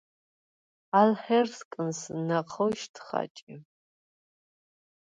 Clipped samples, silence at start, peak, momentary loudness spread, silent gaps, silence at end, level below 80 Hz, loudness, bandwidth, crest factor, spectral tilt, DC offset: under 0.1%; 0.95 s; -8 dBFS; 12 LU; 1.65-1.71 s, 2.89-2.94 s, 3.30-3.35 s, 3.42-3.47 s; 1.5 s; -76 dBFS; -28 LUFS; 9.2 kHz; 22 dB; -5.5 dB/octave; under 0.1%